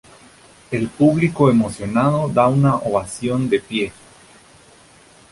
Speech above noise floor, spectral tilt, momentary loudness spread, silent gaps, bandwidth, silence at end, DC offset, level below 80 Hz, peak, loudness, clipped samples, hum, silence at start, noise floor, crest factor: 31 dB; -7 dB/octave; 9 LU; none; 11.5 kHz; 1.4 s; under 0.1%; -50 dBFS; -2 dBFS; -18 LUFS; under 0.1%; none; 0.7 s; -48 dBFS; 16 dB